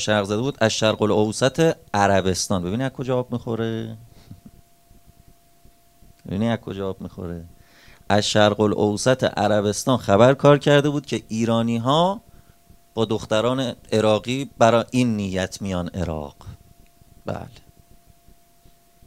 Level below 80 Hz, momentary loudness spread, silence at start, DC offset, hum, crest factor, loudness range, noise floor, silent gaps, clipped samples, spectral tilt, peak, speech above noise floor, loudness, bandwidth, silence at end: -50 dBFS; 16 LU; 0 s; 0.1%; none; 22 dB; 13 LU; -54 dBFS; none; under 0.1%; -5 dB/octave; 0 dBFS; 34 dB; -21 LUFS; 16 kHz; 1.6 s